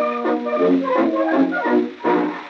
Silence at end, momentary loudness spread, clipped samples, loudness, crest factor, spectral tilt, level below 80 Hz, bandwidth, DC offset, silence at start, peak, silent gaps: 0 s; 3 LU; under 0.1%; -19 LUFS; 12 dB; -7.5 dB/octave; -70 dBFS; 6.6 kHz; under 0.1%; 0 s; -6 dBFS; none